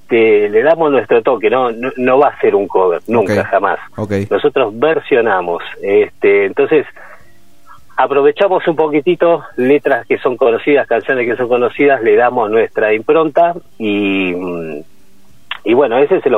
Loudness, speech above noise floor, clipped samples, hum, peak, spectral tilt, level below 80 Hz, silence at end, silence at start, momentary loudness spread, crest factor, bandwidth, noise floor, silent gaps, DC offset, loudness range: -13 LUFS; 37 dB; under 0.1%; none; 0 dBFS; -7 dB/octave; -56 dBFS; 0 s; 0.1 s; 8 LU; 12 dB; 6.8 kHz; -50 dBFS; none; 1%; 2 LU